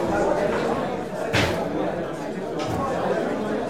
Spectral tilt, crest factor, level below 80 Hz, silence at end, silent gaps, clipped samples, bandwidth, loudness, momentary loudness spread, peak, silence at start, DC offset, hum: -5.5 dB/octave; 16 dB; -48 dBFS; 0 s; none; under 0.1%; 16 kHz; -25 LUFS; 7 LU; -8 dBFS; 0 s; 0.4%; none